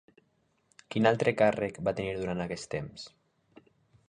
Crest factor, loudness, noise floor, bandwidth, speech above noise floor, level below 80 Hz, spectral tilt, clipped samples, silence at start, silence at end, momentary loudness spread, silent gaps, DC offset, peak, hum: 24 dB; -30 LUFS; -72 dBFS; 10.5 kHz; 43 dB; -60 dBFS; -6 dB/octave; under 0.1%; 0.9 s; 1 s; 16 LU; none; under 0.1%; -8 dBFS; none